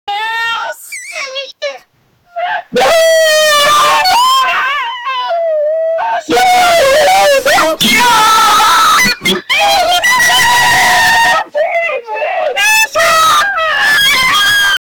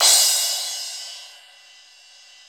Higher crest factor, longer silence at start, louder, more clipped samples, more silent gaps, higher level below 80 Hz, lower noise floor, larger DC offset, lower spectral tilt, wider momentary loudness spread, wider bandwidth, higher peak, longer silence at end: second, 10 dB vs 22 dB; about the same, 0.05 s vs 0 s; first, -8 LUFS vs -18 LUFS; neither; neither; first, -44 dBFS vs -78 dBFS; about the same, -51 dBFS vs -49 dBFS; neither; first, -0.5 dB/octave vs 5 dB/octave; second, 11 LU vs 24 LU; about the same, over 20 kHz vs over 20 kHz; about the same, 0 dBFS vs -2 dBFS; second, 0.2 s vs 1.15 s